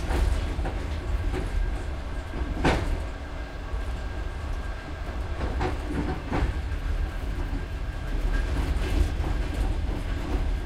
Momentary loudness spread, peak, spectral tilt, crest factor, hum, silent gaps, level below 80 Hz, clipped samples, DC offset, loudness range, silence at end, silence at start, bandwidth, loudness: 8 LU; -8 dBFS; -6.5 dB/octave; 18 dB; none; none; -28 dBFS; under 0.1%; under 0.1%; 2 LU; 0 s; 0 s; 12.5 kHz; -31 LUFS